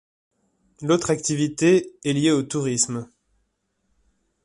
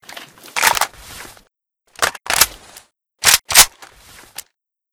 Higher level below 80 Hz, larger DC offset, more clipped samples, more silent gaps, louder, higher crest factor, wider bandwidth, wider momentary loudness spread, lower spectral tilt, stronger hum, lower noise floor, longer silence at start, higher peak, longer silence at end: second, -60 dBFS vs -46 dBFS; neither; second, under 0.1% vs 0.2%; neither; second, -22 LUFS vs -14 LUFS; about the same, 18 dB vs 20 dB; second, 11.5 kHz vs over 20 kHz; second, 6 LU vs 26 LU; first, -4.5 dB/octave vs 1.5 dB/octave; neither; first, -72 dBFS vs -63 dBFS; first, 0.8 s vs 0.15 s; second, -6 dBFS vs 0 dBFS; first, 1.4 s vs 1.25 s